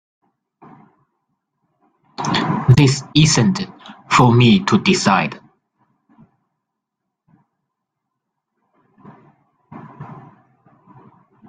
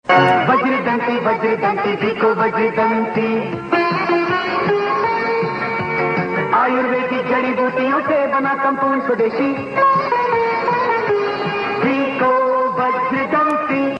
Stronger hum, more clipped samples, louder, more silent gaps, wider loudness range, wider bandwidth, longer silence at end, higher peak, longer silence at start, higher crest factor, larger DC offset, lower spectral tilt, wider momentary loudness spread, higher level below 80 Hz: neither; neither; about the same, -15 LUFS vs -17 LUFS; neither; first, 7 LU vs 1 LU; about the same, 9.6 kHz vs 9 kHz; first, 1.3 s vs 0 s; about the same, 0 dBFS vs -2 dBFS; first, 2.2 s vs 0.05 s; about the same, 20 dB vs 16 dB; neither; second, -5 dB/octave vs -7 dB/octave; first, 25 LU vs 4 LU; first, -50 dBFS vs -58 dBFS